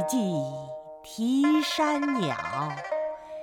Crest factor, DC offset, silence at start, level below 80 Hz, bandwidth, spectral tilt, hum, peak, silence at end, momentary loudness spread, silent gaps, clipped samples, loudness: 14 dB; under 0.1%; 0 s; -66 dBFS; 17 kHz; -5 dB/octave; none; -12 dBFS; 0 s; 15 LU; none; under 0.1%; -27 LUFS